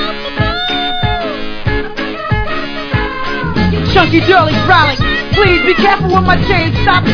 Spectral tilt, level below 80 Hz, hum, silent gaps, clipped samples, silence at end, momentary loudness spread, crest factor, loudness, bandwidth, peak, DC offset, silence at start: -6.5 dB/octave; -24 dBFS; none; none; 0.3%; 0 s; 9 LU; 12 dB; -12 LUFS; 5.4 kHz; 0 dBFS; under 0.1%; 0 s